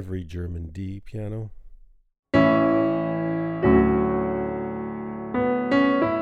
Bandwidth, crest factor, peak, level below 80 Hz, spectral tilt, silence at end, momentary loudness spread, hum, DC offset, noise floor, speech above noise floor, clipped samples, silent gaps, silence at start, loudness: 7.4 kHz; 18 dB; -6 dBFS; -42 dBFS; -9 dB/octave; 0 s; 15 LU; none; under 0.1%; -48 dBFS; 17 dB; under 0.1%; 2.19-2.23 s; 0 s; -23 LUFS